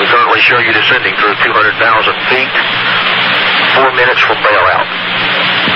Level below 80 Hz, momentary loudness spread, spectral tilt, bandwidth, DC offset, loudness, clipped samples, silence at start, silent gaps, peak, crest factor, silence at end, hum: -46 dBFS; 4 LU; -4.5 dB/octave; 15 kHz; 0.4%; -8 LUFS; under 0.1%; 0 s; none; 0 dBFS; 10 dB; 0 s; none